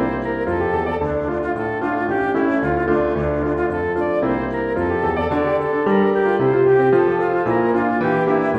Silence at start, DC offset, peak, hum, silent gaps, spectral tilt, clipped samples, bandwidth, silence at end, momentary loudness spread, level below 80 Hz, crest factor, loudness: 0 s; under 0.1%; -6 dBFS; none; none; -9 dB/octave; under 0.1%; 5.6 kHz; 0 s; 6 LU; -40 dBFS; 14 dB; -19 LUFS